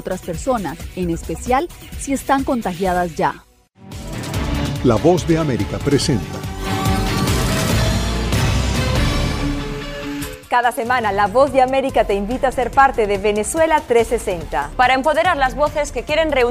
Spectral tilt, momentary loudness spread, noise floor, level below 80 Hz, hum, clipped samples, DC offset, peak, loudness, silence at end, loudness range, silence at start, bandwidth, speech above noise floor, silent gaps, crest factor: -5 dB/octave; 11 LU; -39 dBFS; -30 dBFS; none; under 0.1%; under 0.1%; -2 dBFS; -18 LUFS; 0 s; 5 LU; 0 s; 16 kHz; 21 dB; none; 16 dB